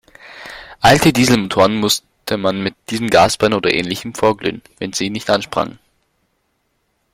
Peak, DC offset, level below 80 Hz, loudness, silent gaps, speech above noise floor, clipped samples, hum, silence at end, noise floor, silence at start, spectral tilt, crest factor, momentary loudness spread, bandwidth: 0 dBFS; under 0.1%; -44 dBFS; -16 LUFS; none; 51 dB; under 0.1%; none; 1.45 s; -66 dBFS; 0.25 s; -4 dB/octave; 18 dB; 13 LU; 16.5 kHz